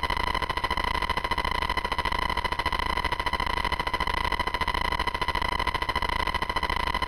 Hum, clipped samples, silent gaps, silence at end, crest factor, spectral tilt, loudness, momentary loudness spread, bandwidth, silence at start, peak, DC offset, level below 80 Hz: none; under 0.1%; none; 0 s; 18 dB; -4 dB/octave; -27 LUFS; 1 LU; 17 kHz; 0 s; -10 dBFS; under 0.1%; -36 dBFS